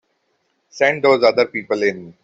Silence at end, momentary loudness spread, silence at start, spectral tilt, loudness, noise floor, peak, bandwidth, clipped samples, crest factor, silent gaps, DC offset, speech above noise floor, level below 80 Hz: 0.15 s; 6 LU; 0.75 s; -4.5 dB/octave; -17 LUFS; -67 dBFS; -2 dBFS; 7.8 kHz; under 0.1%; 16 dB; none; under 0.1%; 51 dB; -64 dBFS